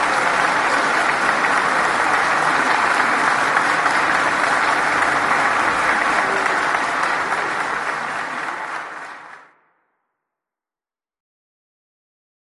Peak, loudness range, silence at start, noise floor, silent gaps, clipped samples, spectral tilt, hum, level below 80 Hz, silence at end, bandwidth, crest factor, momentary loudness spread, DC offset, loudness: -2 dBFS; 12 LU; 0 s; under -90 dBFS; none; under 0.1%; -2 dB/octave; none; -56 dBFS; 3.1 s; 12 kHz; 18 dB; 8 LU; under 0.1%; -17 LUFS